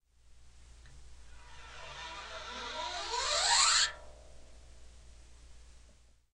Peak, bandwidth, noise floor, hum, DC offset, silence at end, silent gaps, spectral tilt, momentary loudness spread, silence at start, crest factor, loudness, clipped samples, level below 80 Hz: -14 dBFS; 12 kHz; -61 dBFS; none; under 0.1%; 0.45 s; none; 1.5 dB/octave; 25 LU; 0.25 s; 22 dB; -30 LUFS; under 0.1%; -56 dBFS